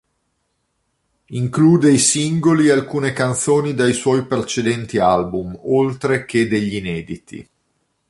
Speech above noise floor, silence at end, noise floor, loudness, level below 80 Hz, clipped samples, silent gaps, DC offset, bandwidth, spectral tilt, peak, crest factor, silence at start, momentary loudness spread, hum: 53 dB; 0.7 s; -69 dBFS; -17 LUFS; -50 dBFS; under 0.1%; none; under 0.1%; 11.5 kHz; -5 dB/octave; -2 dBFS; 16 dB; 1.3 s; 13 LU; none